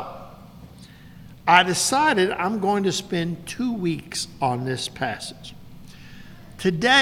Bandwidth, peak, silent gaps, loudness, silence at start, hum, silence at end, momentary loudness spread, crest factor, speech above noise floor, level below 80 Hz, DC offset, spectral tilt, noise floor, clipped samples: 17 kHz; 0 dBFS; none; -22 LUFS; 0 s; none; 0 s; 19 LU; 24 dB; 23 dB; -54 dBFS; under 0.1%; -3.5 dB/octave; -45 dBFS; under 0.1%